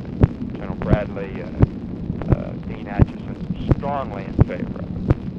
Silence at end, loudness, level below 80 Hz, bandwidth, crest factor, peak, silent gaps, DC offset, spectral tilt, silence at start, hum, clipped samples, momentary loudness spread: 0 s; -23 LUFS; -30 dBFS; 5.8 kHz; 20 dB; 0 dBFS; none; under 0.1%; -10 dB/octave; 0 s; none; under 0.1%; 9 LU